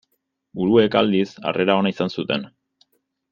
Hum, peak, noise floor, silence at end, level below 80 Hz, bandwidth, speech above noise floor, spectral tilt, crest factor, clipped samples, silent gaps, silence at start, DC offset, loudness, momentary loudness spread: none; -2 dBFS; -73 dBFS; 0.85 s; -60 dBFS; 7.2 kHz; 54 dB; -7 dB/octave; 20 dB; under 0.1%; none; 0.55 s; under 0.1%; -20 LUFS; 10 LU